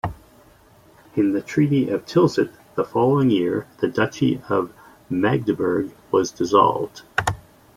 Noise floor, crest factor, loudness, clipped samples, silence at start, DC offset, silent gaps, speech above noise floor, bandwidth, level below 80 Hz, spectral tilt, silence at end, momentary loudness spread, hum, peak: -52 dBFS; 18 dB; -21 LUFS; under 0.1%; 0.05 s; under 0.1%; none; 32 dB; 15.5 kHz; -52 dBFS; -6.5 dB/octave; 0.35 s; 10 LU; none; -2 dBFS